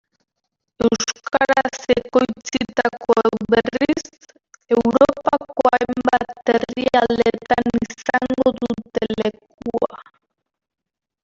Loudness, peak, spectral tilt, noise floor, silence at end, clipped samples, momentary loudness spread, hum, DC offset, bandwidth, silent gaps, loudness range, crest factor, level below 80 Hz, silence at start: -19 LUFS; -2 dBFS; -4.5 dB/octave; -78 dBFS; 1.2 s; under 0.1%; 7 LU; none; under 0.1%; 7.6 kHz; 9.54-9.58 s; 4 LU; 18 dB; -50 dBFS; 0.8 s